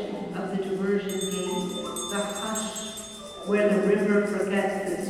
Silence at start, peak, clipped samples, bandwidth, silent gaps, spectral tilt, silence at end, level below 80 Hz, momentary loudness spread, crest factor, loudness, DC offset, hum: 0 s; -12 dBFS; under 0.1%; 14.5 kHz; none; -4.5 dB/octave; 0 s; -60 dBFS; 11 LU; 16 dB; -27 LUFS; under 0.1%; none